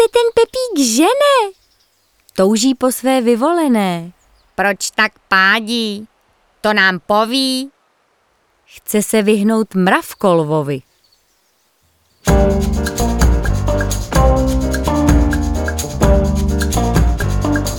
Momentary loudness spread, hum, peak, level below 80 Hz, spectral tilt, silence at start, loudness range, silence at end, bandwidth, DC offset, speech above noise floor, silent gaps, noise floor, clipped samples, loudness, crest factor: 8 LU; none; 0 dBFS; -22 dBFS; -5 dB/octave; 0 s; 3 LU; 0 s; 19.5 kHz; under 0.1%; 45 dB; none; -59 dBFS; under 0.1%; -15 LUFS; 16 dB